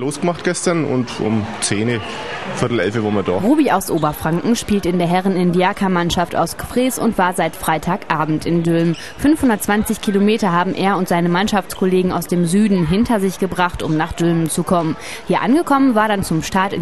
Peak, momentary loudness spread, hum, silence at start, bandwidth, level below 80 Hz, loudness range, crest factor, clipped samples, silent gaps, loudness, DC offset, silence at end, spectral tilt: 0 dBFS; 5 LU; none; 0 s; 13 kHz; -40 dBFS; 2 LU; 16 dB; under 0.1%; none; -17 LUFS; 1%; 0 s; -5.5 dB/octave